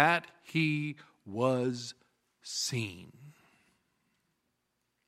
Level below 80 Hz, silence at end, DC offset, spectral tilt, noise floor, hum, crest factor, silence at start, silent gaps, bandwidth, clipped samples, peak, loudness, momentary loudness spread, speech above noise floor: -78 dBFS; 1.75 s; under 0.1%; -4.5 dB/octave; -81 dBFS; none; 28 dB; 0 s; none; 15.5 kHz; under 0.1%; -8 dBFS; -33 LUFS; 19 LU; 49 dB